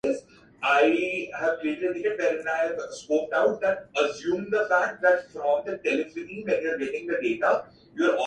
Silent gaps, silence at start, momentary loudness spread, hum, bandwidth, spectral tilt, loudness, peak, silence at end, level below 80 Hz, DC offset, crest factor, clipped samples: none; 0.05 s; 7 LU; none; 9.4 kHz; -4.5 dB/octave; -26 LUFS; -8 dBFS; 0 s; -66 dBFS; under 0.1%; 18 dB; under 0.1%